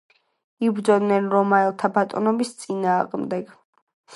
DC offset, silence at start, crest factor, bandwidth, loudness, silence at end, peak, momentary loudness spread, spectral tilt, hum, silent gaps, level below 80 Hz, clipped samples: under 0.1%; 0.6 s; 18 dB; 11.5 kHz; -22 LUFS; 0 s; -4 dBFS; 9 LU; -6.5 dB/octave; none; 3.65-3.73 s, 3.82-3.87 s, 3.93-4.04 s; -74 dBFS; under 0.1%